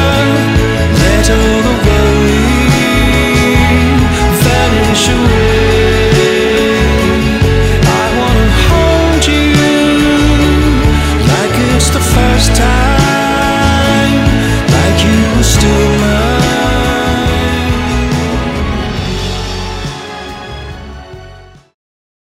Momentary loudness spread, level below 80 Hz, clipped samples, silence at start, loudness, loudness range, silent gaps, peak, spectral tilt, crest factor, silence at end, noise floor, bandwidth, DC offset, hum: 8 LU; -16 dBFS; under 0.1%; 0 s; -10 LUFS; 6 LU; none; 0 dBFS; -5 dB/octave; 8 dB; 0.8 s; -35 dBFS; 16.5 kHz; under 0.1%; none